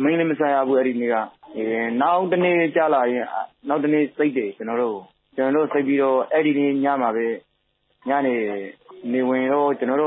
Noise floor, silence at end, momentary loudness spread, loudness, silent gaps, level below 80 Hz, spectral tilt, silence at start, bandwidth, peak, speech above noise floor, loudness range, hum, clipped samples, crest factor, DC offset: -68 dBFS; 0 s; 10 LU; -21 LUFS; none; -78 dBFS; -11 dB/octave; 0 s; 4 kHz; -6 dBFS; 48 dB; 3 LU; none; under 0.1%; 14 dB; under 0.1%